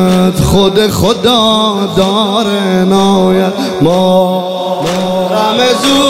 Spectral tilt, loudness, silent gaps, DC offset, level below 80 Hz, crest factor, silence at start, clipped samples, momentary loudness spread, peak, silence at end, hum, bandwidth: -5 dB/octave; -10 LUFS; none; 0.8%; -34 dBFS; 10 dB; 0 s; under 0.1%; 5 LU; 0 dBFS; 0 s; none; 16 kHz